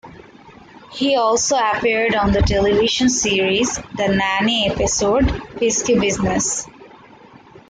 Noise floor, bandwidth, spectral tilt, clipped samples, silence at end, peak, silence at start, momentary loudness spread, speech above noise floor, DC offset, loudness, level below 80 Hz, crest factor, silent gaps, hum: -44 dBFS; 10 kHz; -3.5 dB/octave; under 0.1%; 0.85 s; -6 dBFS; 0.05 s; 6 LU; 27 dB; under 0.1%; -17 LUFS; -34 dBFS; 14 dB; none; none